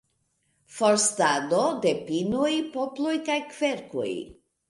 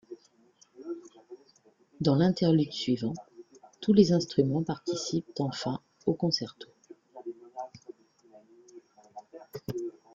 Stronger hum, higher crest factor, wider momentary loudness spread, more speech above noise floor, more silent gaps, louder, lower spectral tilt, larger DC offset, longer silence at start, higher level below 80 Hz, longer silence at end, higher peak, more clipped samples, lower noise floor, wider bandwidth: neither; second, 18 dB vs 24 dB; second, 10 LU vs 25 LU; first, 47 dB vs 37 dB; neither; first, -25 LUFS vs -28 LUFS; second, -3 dB/octave vs -6.5 dB/octave; neither; first, 0.7 s vs 0.1 s; about the same, -66 dBFS vs -66 dBFS; about the same, 0.35 s vs 0.25 s; about the same, -10 dBFS vs -8 dBFS; neither; first, -72 dBFS vs -64 dBFS; second, 11.5 kHz vs 13.5 kHz